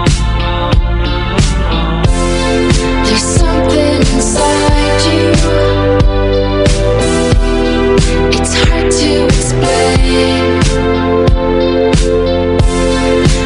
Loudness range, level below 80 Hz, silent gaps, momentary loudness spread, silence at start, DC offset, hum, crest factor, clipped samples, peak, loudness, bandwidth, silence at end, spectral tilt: 1 LU; -16 dBFS; none; 3 LU; 0 s; under 0.1%; none; 10 dB; under 0.1%; 0 dBFS; -11 LUFS; 11 kHz; 0 s; -5 dB/octave